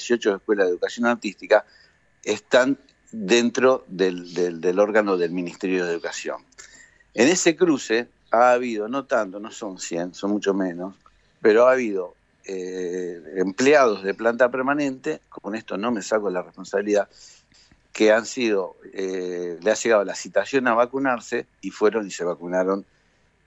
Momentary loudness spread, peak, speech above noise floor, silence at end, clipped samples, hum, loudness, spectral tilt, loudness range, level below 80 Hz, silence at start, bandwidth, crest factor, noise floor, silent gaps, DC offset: 14 LU; -4 dBFS; 40 dB; 0.65 s; under 0.1%; none; -22 LUFS; -4 dB/octave; 3 LU; -68 dBFS; 0 s; 8.4 kHz; 20 dB; -62 dBFS; none; under 0.1%